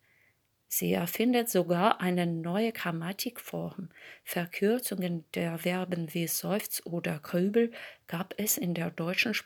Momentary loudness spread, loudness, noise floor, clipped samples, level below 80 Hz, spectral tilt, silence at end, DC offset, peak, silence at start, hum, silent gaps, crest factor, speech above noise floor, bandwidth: 11 LU; -31 LUFS; -70 dBFS; under 0.1%; -76 dBFS; -4.5 dB/octave; 0.05 s; under 0.1%; -6 dBFS; 0.7 s; none; none; 24 dB; 39 dB; over 20 kHz